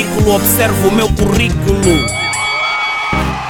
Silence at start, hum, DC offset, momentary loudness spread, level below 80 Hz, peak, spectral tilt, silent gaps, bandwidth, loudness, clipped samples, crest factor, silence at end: 0 s; none; under 0.1%; 4 LU; -24 dBFS; 0 dBFS; -4.5 dB/octave; none; 19 kHz; -12 LUFS; under 0.1%; 12 dB; 0 s